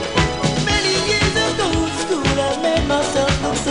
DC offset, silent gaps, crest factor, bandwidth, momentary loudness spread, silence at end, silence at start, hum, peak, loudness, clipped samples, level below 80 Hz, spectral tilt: under 0.1%; none; 18 dB; 11 kHz; 3 LU; 0 s; 0 s; none; 0 dBFS; -18 LUFS; under 0.1%; -32 dBFS; -4 dB/octave